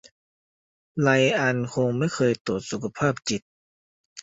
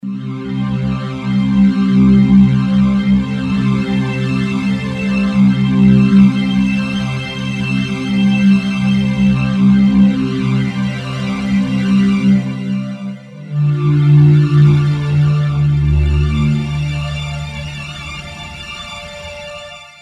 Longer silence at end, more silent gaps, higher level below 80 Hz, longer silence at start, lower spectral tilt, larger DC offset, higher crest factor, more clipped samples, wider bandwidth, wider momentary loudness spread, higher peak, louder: second, 0 s vs 0.15 s; first, 2.40-2.45 s, 3.42-4.16 s vs none; second, -60 dBFS vs -30 dBFS; first, 0.95 s vs 0.05 s; second, -5.5 dB/octave vs -8 dB/octave; neither; first, 20 dB vs 14 dB; neither; about the same, 8 kHz vs 8.8 kHz; second, 11 LU vs 16 LU; second, -6 dBFS vs 0 dBFS; second, -24 LUFS vs -14 LUFS